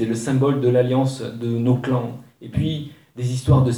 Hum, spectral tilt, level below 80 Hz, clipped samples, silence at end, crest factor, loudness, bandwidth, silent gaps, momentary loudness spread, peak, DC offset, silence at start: none; -7.5 dB/octave; -42 dBFS; under 0.1%; 0 s; 16 dB; -21 LUFS; 11.5 kHz; none; 12 LU; -4 dBFS; under 0.1%; 0 s